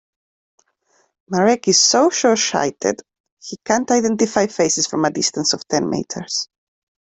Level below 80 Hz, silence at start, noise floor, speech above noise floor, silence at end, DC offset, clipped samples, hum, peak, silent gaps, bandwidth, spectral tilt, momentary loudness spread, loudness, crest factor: -60 dBFS; 1.3 s; -63 dBFS; 45 dB; 0.6 s; under 0.1%; under 0.1%; none; -2 dBFS; 3.20-3.24 s, 3.32-3.37 s; 8.4 kHz; -2.5 dB/octave; 12 LU; -17 LUFS; 18 dB